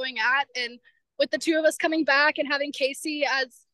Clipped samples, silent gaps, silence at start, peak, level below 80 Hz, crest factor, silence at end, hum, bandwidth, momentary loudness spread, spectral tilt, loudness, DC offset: under 0.1%; none; 0 s; -8 dBFS; -82 dBFS; 16 dB; 0.25 s; none; 12.5 kHz; 8 LU; -1 dB/octave; -24 LUFS; under 0.1%